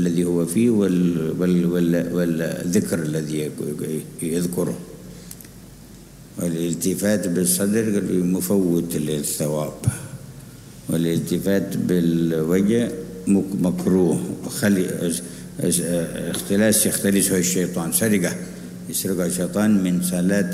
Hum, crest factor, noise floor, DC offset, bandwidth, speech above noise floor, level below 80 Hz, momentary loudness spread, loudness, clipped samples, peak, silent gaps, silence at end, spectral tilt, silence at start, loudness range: none; 16 dB; -42 dBFS; under 0.1%; 16 kHz; 22 dB; -52 dBFS; 11 LU; -21 LUFS; under 0.1%; -6 dBFS; none; 0 s; -5.5 dB/octave; 0 s; 5 LU